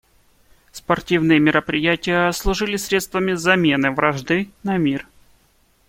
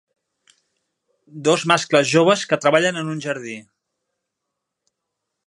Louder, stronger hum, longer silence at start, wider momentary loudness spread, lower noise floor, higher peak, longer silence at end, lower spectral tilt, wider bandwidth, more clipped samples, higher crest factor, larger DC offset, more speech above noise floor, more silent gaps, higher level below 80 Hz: about the same, -19 LUFS vs -18 LUFS; neither; second, 0.75 s vs 1.35 s; second, 7 LU vs 12 LU; second, -59 dBFS vs -80 dBFS; about the same, -2 dBFS vs 0 dBFS; second, 0.85 s vs 1.85 s; about the same, -5 dB/octave vs -4 dB/octave; first, 16.5 kHz vs 11.5 kHz; neither; about the same, 18 dB vs 22 dB; neither; second, 40 dB vs 62 dB; neither; first, -38 dBFS vs -72 dBFS